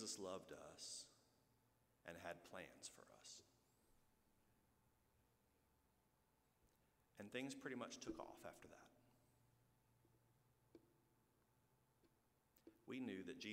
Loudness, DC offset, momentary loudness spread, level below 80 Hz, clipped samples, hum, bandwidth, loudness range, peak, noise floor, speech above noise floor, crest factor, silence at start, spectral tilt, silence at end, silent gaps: -55 LUFS; under 0.1%; 13 LU; -84 dBFS; under 0.1%; none; 15.5 kHz; 9 LU; -36 dBFS; -83 dBFS; 28 dB; 24 dB; 0 s; -3 dB/octave; 0 s; none